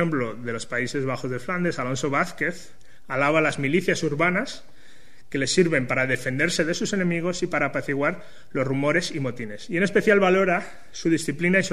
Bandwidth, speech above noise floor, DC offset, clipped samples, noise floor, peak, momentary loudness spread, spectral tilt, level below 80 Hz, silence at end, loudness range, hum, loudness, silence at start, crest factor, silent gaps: 13.5 kHz; 29 dB; 1%; under 0.1%; -53 dBFS; -6 dBFS; 10 LU; -5 dB/octave; -54 dBFS; 0 s; 2 LU; none; -24 LUFS; 0 s; 18 dB; none